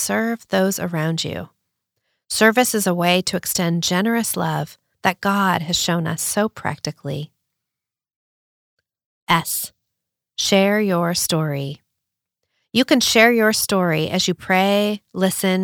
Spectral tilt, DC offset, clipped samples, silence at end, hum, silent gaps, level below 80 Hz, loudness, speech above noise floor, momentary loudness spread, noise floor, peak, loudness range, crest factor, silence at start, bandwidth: -4 dB/octave; under 0.1%; under 0.1%; 0 s; none; 8.16-8.77 s, 9.05-9.27 s; -58 dBFS; -19 LUFS; 67 dB; 13 LU; -86 dBFS; -2 dBFS; 9 LU; 20 dB; 0 s; over 20 kHz